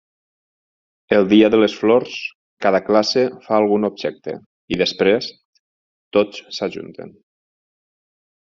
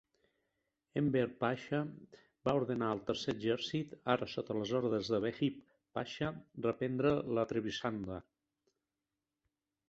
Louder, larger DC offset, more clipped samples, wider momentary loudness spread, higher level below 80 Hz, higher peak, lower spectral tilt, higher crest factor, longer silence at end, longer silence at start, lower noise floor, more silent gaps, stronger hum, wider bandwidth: first, -18 LUFS vs -37 LUFS; neither; neither; first, 17 LU vs 9 LU; first, -58 dBFS vs -68 dBFS; first, -2 dBFS vs -14 dBFS; second, -3.5 dB/octave vs -5 dB/octave; about the same, 18 dB vs 22 dB; second, 1.3 s vs 1.7 s; first, 1.1 s vs 0.95 s; about the same, under -90 dBFS vs under -90 dBFS; first, 2.35-2.57 s, 4.46-4.68 s, 5.45-5.53 s, 5.59-6.11 s vs none; neither; about the same, 7.4 kHz vs 8 kHz